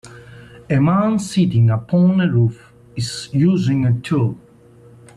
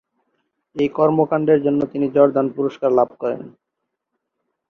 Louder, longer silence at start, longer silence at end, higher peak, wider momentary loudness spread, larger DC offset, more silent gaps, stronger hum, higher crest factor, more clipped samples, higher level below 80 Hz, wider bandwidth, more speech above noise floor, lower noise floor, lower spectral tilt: about the same, -17 LUFS vs -18 LUFS; second, 0.05 s vs 0.75 s; second, 0.8 s vs 1.2 s; about the same, -4 dBFS vs -2 dBFS; about the same, 10 LU vs 10 LU; neither; neither; neither; second, 12 dB vs 18 dB; neither; first, -52 dBFS vs -62 dBFS; first, 11.5 kHz vs 6.4 kHz; second, 30 dB vs 61 dB; second, -46 dBFS vs -79 dBFS; second, -7.5 dB/octave vs -9 dB/octave